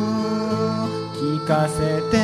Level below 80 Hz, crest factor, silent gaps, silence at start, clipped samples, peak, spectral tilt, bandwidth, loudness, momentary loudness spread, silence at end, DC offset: -46 dBFS; 14 dB; none; 0 s; under 0.1%; -6 dBFS; -6.5 dB/octave; 13.5 kHz; -22 LUFS; 5 LU; 0 s; under 0.1%